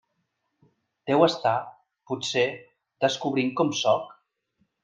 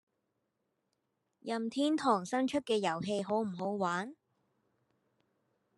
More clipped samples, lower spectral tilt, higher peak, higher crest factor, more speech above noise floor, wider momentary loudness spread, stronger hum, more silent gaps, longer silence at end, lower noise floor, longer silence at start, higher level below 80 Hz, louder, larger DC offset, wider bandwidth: neither; about the same, -4.5 dB/octave vs -5 dB/octave; first, -6 dBFS vs -16 dBFS; about the same, 22 dB vs 20 dB; first, 53 dB vs 49 dB; first, 17 LU vs 8 LU; neither; neither; second, 0.7 s vs 1.65 s; second, -77 dBFS vs -83 dBFS; second, 1.05 s vs 1.45 s; first, -74 dBFS vs -80 dBFS; first, -25 LUFS vs -34 LUFS; neither; second, 9.8 kHz vs 12 kHz